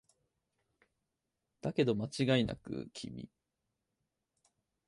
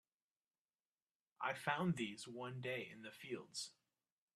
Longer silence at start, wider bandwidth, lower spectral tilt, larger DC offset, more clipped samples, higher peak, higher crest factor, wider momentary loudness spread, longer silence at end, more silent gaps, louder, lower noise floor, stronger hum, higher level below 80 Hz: first, 1.65 s vs 1.4 s; second, 11.5 kHz vs 13.5 kHz; first, -6 dB/octave vs -4.5 dB/octave; neither; neither; first, -18 dBFS vs -24 dBFS; about the same, 22 dB vs 24 dB; first, 16 LU vs 11 LU; first, 1.6 s vs 0.65 s; neither; first, -35 LUFS vs -45 LUFS; about the same, -87 dBFS vs under -90 dBFS; neither; first, -64 dBFS vs -84 dBFS